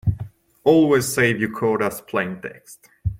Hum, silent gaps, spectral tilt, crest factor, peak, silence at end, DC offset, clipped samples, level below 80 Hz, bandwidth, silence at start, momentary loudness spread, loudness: none; none; -5.5 dB/octave; 18 dB; -2 dBFS; 0 s; under 0.1%; under 0.1%; -42 dBFS; 16.5 kHz; 0.05 s; 18 LU; -20 LUFS